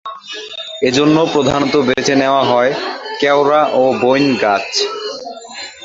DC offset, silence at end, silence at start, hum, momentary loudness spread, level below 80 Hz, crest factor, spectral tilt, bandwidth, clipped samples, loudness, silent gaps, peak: under 0.1%; 0 s; 0.05 s; none; 15 LU; -50 dBFS; 14 dB; -4.5 dB/octave; 7.8 kHz; under 0.1%; -13 LUFS; none; 0 dBFS